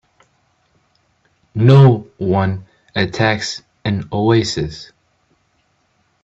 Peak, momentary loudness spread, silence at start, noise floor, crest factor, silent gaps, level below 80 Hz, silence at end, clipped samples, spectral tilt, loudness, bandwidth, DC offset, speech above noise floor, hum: 0 dBFS; 16 LU; 1.55 s; -62 dBFS; 18 dB; none; -48 dBFS; 1.4 s; under 0.1%; -6.5 dB/octave; -16 LUFS; 7.8 kHz; under 0.1%; 48 dB; none